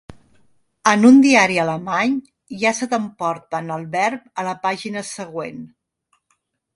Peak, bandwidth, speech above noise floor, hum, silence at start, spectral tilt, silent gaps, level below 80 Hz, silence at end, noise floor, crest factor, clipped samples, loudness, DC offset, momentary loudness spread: 0 dBFS; 11.5 kHz; 51 dB; none; 0.1 s; -4.5 dB/octave; none; -62 dBFS; 1.1 s; -69 dBFS; 20 dB; under 0.1%; -18 LUFS; under 0.1%; 18 LU